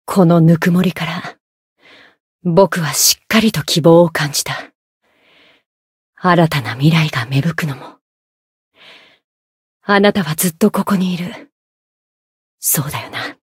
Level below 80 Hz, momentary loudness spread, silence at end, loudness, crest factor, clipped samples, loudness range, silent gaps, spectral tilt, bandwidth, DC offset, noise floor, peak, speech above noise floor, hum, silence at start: -54 dBFS; 14 LU; 0.2 s; -14 LUFS; 16 dB; under 0.1%; 6 LU; 1.40-1.76 s, 2.20-2.39 s, 4.75-5.01 s, 5.66-6.13 s, 8.01-8.71 s, 9.24-9.80 s, 11.52-12.58 s; -4.5 dB/octave; 16.5 kHz; under 0.1%; -52 dBFS; 0 dBFS; 38 dB; none; 0.1 s